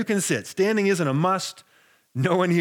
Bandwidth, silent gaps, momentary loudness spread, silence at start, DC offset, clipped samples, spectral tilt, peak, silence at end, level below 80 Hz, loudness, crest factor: 19 kHz; none; 7 LU; 0 s; under 0.1%; under 0.1%; -5 dB/octave; -6 dBFS; 0 s; -76 dBFS; -23 LUFS; 18 dB